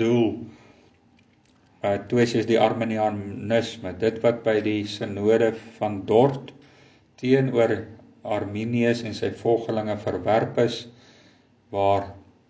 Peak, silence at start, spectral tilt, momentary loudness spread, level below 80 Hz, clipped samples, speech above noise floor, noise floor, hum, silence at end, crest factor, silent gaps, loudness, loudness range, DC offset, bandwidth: -4 dBFS; 0 s; -6.5 dB/octave; 12 LU; -56 dBFS; under 0.1%; 36 dB; -59 dBFS; none; 0.3 s; 20 dB; none; -24 LUFS; 2 LU; under 0.1%; 8 kHz